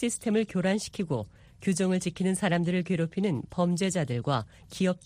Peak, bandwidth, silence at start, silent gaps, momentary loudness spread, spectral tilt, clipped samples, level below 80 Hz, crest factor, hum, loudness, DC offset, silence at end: -12 dBFS; 15 kHz; 0 s; none; 6 LU; -5.5 dB/octave; under 0.1%; -60 dBFS; 16 dB; none; -29 LUFS; under 0.1%; 0.1 s